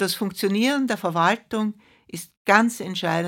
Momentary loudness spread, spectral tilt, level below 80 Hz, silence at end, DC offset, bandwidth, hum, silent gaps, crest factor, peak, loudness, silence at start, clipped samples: 13 LU; -4.5 dB/octave; -68 dBFS; 0 s; under 0.1%; 17 kHz; none; 2.37-2.45 s; 22 dB; 0 dBFS; -22 LUFS; 0 s; under 0.1%